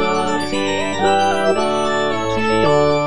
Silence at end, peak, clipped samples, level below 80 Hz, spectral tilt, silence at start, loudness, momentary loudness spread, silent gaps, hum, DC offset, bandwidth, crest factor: 0 s; -2 dBFS; under 0.1%; -44 dBFS; -4.5 dB/octave; 0 s; -17 LUFS; 5 LU; none; none; 4%; 10.5 kHz; 14 dB